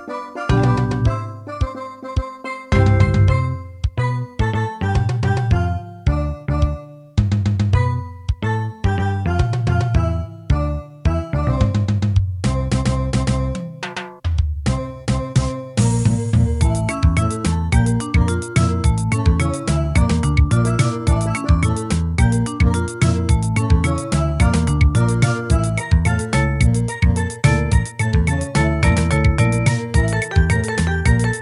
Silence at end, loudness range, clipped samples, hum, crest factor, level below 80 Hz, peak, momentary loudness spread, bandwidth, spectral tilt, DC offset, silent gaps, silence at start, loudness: 0 s; 3 LU; under 0.1%; none; 16 dB; -24 dBFS; -2 dBFS; 8 LU; 11.5 kHz; -6.5 dB/octave; under 0.1%; none; 0 s; -19 LUFS